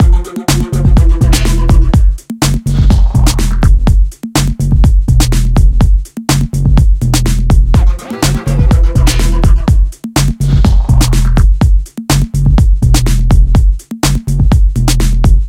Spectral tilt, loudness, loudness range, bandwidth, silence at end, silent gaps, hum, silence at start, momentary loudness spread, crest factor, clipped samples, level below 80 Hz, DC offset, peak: -5.5 dB/octave; -11 LUFS; 1 LU; 15.5 kHz; 0 s; none; none; 0 s; 4 LU; 8 dB; 0.2%; -10 dBFS; under 0.1%; 0 dBFS